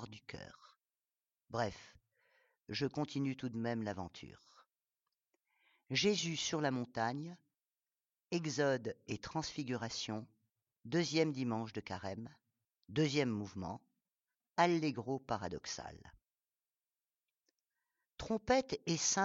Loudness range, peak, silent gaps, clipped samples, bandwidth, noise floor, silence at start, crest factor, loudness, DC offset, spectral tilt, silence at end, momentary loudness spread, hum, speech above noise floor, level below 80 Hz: 5 LU; -16 dBFS; none; under 0.1%; 8 kHz; under -90 dBFS; 0 s; 24 dB; -38 LUFS; under 0.1%; -4 dB/octave; 0 s; 17 LU; none; over 52 dB; -68 dBFS